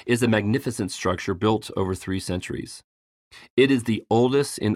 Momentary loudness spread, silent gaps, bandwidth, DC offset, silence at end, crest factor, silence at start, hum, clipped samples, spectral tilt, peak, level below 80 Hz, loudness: 10 LU; 2.84-3.31 s, 3.50-3.57 s; 15.5 kHz; under 0.1%; 0 s; 18 dB; 0.05 s; none; under 0.1%; -5.5 dB/octave; -6 dBFS; -54 dBFS; -24 LUFS